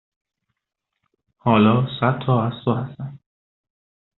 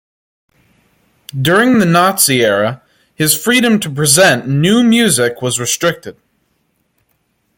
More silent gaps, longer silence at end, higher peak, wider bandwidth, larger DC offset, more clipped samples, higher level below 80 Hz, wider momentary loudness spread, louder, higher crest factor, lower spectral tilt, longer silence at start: neither; second, 1 s vs 1.45 s; about the same, -2 dBFS vs 0 dBFS; second, 4.1 kHz vs 17 kHz; neither; neither; second, -58 dBFS vs -52 dBFS; first, 17 LU vs 8 LU; second, -20 LUFS vs -11 LUFS; first, 20 dB vs 14 dB; first, -6.5 dB/octave vs -3.5 dB/octave; about the same, 1.45 s vs 1.35 s